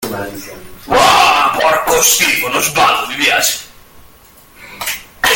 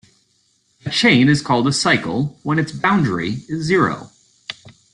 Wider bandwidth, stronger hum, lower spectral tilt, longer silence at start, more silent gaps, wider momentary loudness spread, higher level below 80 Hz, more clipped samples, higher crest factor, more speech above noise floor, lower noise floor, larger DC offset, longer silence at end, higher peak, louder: first, over 20 kHz vs 11 kHz; neither; second, -0.5 dB/octave vs -5 dB/octave; second, 0 s vs 0.85 s; neither; second, 15 LU vs 19 LU; first, -42 dBFS vs -52 dBFS; neither; about the same, 14 dB vs 18 dB; second, 30 dB vs 45 dB; second, -43 dBFS vs -62 dBFS; neither; second, 0 s vs 0.25 s; about the same, 0 dBFS vs -2 dBFS; first, -11 LUFS vs -17 LUFS